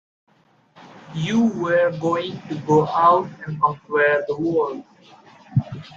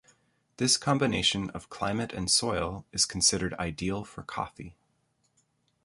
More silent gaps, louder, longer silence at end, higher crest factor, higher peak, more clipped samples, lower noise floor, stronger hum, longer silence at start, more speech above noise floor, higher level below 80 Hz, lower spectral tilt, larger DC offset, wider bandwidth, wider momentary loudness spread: neither; first, -20 LUFS vs -28 LUFS; second, 0 s vs 1.15 s; about the same, 18 dB vs 22 dB; first, -4 dBFS vs -8 dBFS; neither; second, -57 dBFS vs -73 dBFS; neither; first, 0.8 s vs 0.6 s; second, 37 dB vs 44 dB; second, -58 dBFS vs -52 dBFS; first, -7 dB/octave vs -3 dB/octave; neither; second, 7.6 kHz vs 11.5 kHz; about the same, 12 LU vs 13 LU